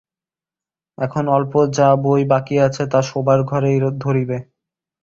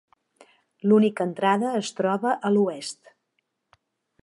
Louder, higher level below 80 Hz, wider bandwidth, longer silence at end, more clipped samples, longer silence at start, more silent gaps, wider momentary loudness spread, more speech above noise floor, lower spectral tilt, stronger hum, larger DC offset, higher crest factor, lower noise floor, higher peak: first, -17 LUFS vs -23 LUFS; first, -54 dBFS vs -76 dBFS; second, 7.6 kHz vs 11.5 kHz; second, 0.6 s vs 1.3 s; neither; first, 1 s vs 0.85 s; neither; second, 8 LU vs 13 LU; first, over 74 dB vs 53 dB; first, -7.5 dB/octave vs -6 dB/octave; neither; neither; about the same, 16 dB vs 18 dB; first, under -90 dBFS vs -76 dBFS; first, -2 dBFS vs -8 dBFS